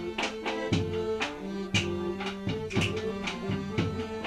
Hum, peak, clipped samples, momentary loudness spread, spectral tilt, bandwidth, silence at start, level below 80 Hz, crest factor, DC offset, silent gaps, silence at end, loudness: none; -14 dBFS; under 0.1%; 4 LU; -5 dB/octave; 13.5 kHz; 0 s; -52 dBFS; 18 dB; under 0.1%; none; 0 s; -31 LUFS